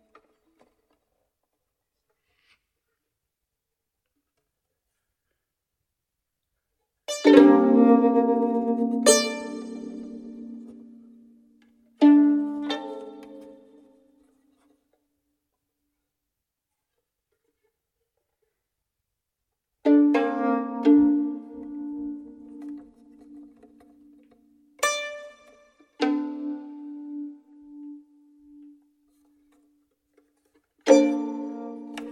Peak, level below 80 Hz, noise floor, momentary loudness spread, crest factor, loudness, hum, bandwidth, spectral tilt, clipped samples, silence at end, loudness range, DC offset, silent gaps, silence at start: 0 dBFS; -70 dBFS; -84 dBFS; 24 LU; 26 dB; -21 LUFS; none; 16.5 kHz; -3.5 dB/octave; under 0.1%; 0 s; 19 LU; under 0.1%; none; 7.1 s